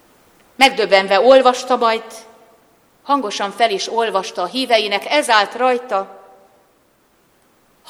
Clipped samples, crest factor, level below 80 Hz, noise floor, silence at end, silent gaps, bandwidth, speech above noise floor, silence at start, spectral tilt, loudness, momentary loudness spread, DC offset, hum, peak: under 0.1%; 18 dB; -64 dBFS; -57 dBFS; 1.75 s; none; 15.5 kHz; 42 dB; 0.6 s; -2 dB/octave; -15 LUFS; 11 LU; under 0.1%; none; 0 dBFS